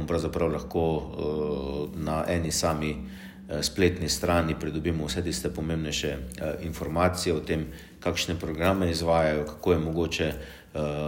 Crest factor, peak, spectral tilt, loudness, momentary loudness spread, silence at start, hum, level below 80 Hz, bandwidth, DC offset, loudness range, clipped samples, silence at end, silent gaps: 18 dB; -10 dBFS; -5 dB/octave; -28 LUFS; 9 LU; 0 s; none; -42 dBFS; 16.5 kHz; under 0.1%; 2 LU; under 0.1%; 0 s; none